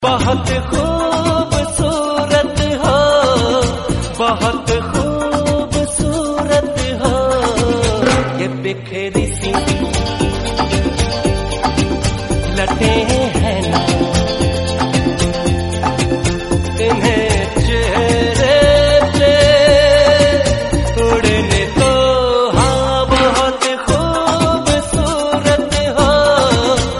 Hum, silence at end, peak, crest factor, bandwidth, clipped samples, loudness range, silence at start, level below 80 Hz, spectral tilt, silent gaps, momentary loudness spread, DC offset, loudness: none; 0 s; 0 dBFS; 14 dB; 11.5 kHz; under 0.1%; 6 LU; 0 s; -24 dBFS; -5 dB/octave; none; 7 LU; 0.2%; -14 LUFS